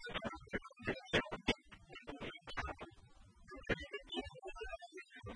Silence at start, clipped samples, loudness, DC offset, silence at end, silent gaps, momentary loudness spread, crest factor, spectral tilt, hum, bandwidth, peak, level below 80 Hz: 0 s; under 0.1%; -44 LUFS; under 0.1%; 0 s; none; 16 LU; 26 dB; -4.5 dB/octave; none; 10.5 kHz; -20 dBFS; -58 dBFS